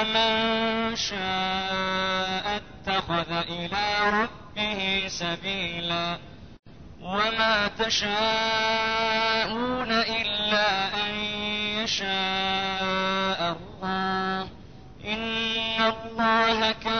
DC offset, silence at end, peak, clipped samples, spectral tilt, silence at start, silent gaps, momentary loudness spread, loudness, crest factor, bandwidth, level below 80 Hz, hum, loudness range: 0.3%; 0 s; -10 dBFS; under 0.1%; -3.5 dB/octave; 0 s; 6.59-6.63 s; 7 LU; -25 LUFS; 16 dB; 6.6 kHz; -52 dBFS; none; 4 LU